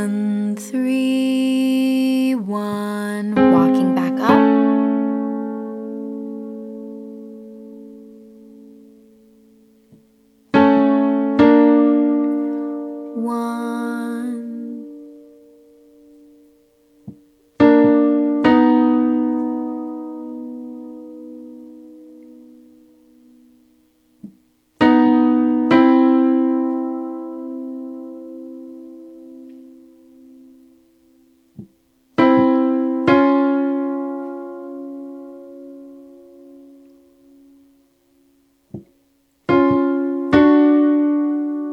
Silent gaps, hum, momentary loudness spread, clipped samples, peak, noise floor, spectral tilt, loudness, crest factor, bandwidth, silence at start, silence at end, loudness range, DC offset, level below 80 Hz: none; none; 24 LU; under 0.1%; 0 dBFS; -61 dBFS; -7 dB/octave; -17 LUFS; 18 dB; 12.5 kHz; 0 s; 0 s; 19 LU; under 0.1%; -56 dBFS